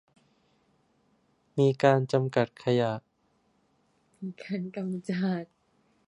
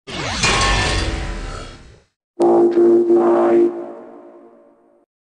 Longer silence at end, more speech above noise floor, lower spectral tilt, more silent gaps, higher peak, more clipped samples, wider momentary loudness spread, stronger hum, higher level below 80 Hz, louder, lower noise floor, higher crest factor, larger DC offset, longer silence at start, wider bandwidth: second, 0.65 s vs 1 s; first, 43 dB vs 38 dB; first, -7.5 dB/octave vs -4.5 dB/octave; second, none vs 2.16-2.34 s; about the same, -6 dBFS vs -6 dBFS; neither; second, 17 LU vs 20 LU; neither; second, -74 dBFS vs -30 dBFS; second, -28 LUFS vs -15 LUFS; first, -70 dBFS vs -51 dBFS; first, 24 dB vs 12 dB; neither; first, 1.55 s vs 0.1 s; about the same, 11 kHz vs 10 kHz